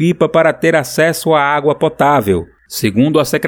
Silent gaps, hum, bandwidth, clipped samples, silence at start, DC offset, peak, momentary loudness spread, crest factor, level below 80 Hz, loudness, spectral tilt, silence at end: none; none; over 20 kHz; under 0.1%; 0 s; under 0.1%; 0 dBFS; 6 LU; 12 dB; -46 dBFS; -13 LUFS; -5.5 dB/octave; 0 s